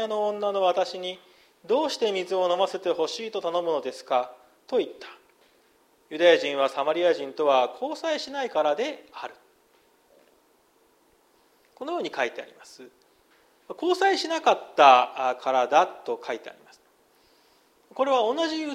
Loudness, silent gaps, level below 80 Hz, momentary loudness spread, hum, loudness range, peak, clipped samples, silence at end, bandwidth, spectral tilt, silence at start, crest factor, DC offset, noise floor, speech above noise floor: -25 LUFS; none; -80 dBFS; 18 LU; none; 14 LU; -2 dBFS; under 0.1%; 0 s; 14 kHz; -3 dB/octave; 0 s; 24 dB; under 0.1%; -63 dBFS; 38 dB